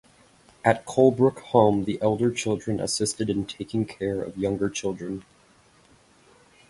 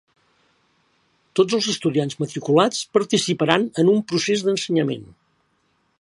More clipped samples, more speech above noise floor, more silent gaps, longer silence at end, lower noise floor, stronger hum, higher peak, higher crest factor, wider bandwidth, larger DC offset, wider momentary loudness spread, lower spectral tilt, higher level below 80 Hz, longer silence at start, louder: neither; second, 34 dB vs 47 dB; neither; first, 1.5 s vs 0.95 s; second, -58 dBFS vs -67 dBFS; neither; second, -4 dBFS vs 0 dBFS; about the same, 22 dB vs 22 dB; about the same, 11.5 kHz vs 11.5 kHz; neither; about the same, 10 LU vs 8 LU; about the same, -5.5 dB/octave vs -4.5 dB/octave; first, -56 dBFS vs -66 dBFS; second, 0.65 s vs 1.35 s; second, -25 LUFS vs -20 LUFS